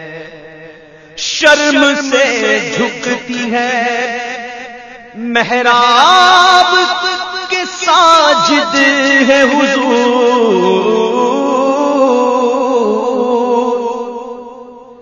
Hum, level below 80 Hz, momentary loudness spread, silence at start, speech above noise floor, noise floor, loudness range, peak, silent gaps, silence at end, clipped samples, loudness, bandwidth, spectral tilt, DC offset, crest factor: none; -54 dBFS; 16 LU; 0 s; 27 dB; -37 dBFS; 6 LU; 0 dBFS; none; 0.05 s; 0.3%; -10 LUFS; 11 kHz; -2.5 dB/octave; under 0.1%; 12 dB